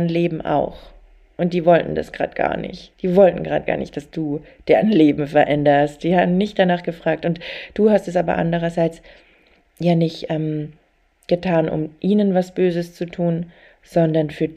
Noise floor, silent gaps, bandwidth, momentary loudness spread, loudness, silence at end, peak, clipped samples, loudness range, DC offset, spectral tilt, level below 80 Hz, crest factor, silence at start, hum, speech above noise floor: -60 dBFS; none; 9.2 kHz; 11 LU; -19 LUFS; 0 s; -2 dBFS; under 0.1%; 5 LU; under 0.1%; -8 dB/octave; -48 dBFS; 18 dB; 0 s; none; 41 dB